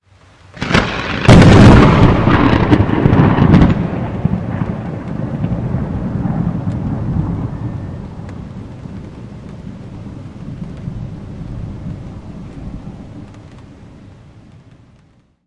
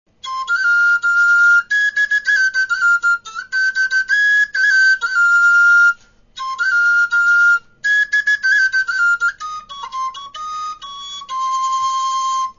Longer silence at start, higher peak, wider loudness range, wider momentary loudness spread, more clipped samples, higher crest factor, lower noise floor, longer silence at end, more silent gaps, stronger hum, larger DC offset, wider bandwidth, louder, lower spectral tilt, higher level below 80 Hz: first, 0.55 s vs 0.25 s; first, 0 dBFS vs -6 dBFS; first, 22 LU vs 7 LU; first, 23 LU vs 16 LU; first, 0.1% vs under 0.1%; about the same, 14 dB vs 10 dB; first, -51 dBFS vs -36 dBFS; first, 1.85 s vs 0.1 s; neither; neither; neither; first, 11 kHz vs 7.4 kHz; about the same, -12 LUFS vs -14 LUFS; first, -7.5 dB/octave vs 2.5 dB/octave; first, -26 dBFS vs -58 dBFS